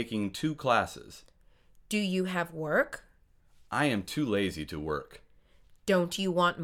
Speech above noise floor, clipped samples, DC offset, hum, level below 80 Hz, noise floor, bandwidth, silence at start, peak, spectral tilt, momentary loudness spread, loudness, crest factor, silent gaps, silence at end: 31 dB; under 0.1%; under 0.1%; none; -58 dBFS; -62 dBFS; 17 kHz; 0 s; -10 dBFS; -5 dB/octave; 10 LU; -30 LUFS; 22 dB; none; 0 s